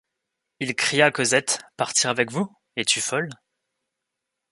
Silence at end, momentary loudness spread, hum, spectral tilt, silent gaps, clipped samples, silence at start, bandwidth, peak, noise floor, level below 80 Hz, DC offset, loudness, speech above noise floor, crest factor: 1.2 s; 11 LU; none; -2 dB/octave; none; under 0.1%; 0.6 s; 11.5 kHz; -2 dBFS; -83 dBFS; -70 dBFS; under 0.1%; -22 LUFS; 59 dB; 24 dB